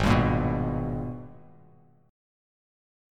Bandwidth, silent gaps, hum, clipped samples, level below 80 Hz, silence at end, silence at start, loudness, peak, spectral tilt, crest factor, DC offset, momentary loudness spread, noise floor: 13.5 kHz; none; none; under 0.1%; -40 dBFS; 1.75 s; 0 s; -27 LUFS; -8 dBFS; -7.5 dB/octave; 20 dB; under 0.1%; 19 LU; -58 dBFS